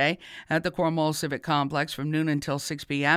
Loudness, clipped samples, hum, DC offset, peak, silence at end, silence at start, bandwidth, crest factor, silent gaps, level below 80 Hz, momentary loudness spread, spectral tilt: -27 LUFS; under 0.1%; none; under 0.1%; -8 dBFS; 0 s; 0 s; 16 kHz; 18 dB; none; -60 dBFS; 5 LU; -5 dB/octave